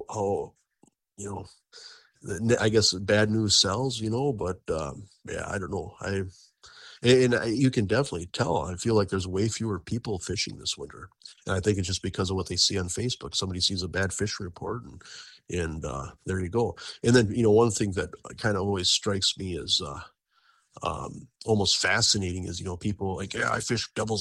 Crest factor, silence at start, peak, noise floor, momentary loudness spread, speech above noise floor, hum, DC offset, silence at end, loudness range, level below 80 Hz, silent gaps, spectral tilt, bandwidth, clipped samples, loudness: 20 dB; 0 s; -6 dBFS; -66 dBFS; 17 LU; 39 dB; none; under 0.1%; 0 s; 5 LU; -52 dBFS; none; -4 dB/octave; 12.5 kHz; under 0.1%; -26 LUFS